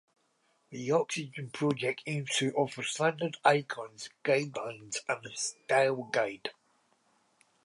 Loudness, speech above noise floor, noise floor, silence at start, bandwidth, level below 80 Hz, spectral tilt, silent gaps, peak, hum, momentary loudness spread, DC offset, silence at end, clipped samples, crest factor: -31 LUFS; 41 dB; -73 dBFS; 0.7 s; 11.5 kHz; -80 dBFS; -4 dB/octave; none; -10 dBFS; none; 13 LU; under 0.1%; 1.15 s; under 0.1%; 24 dB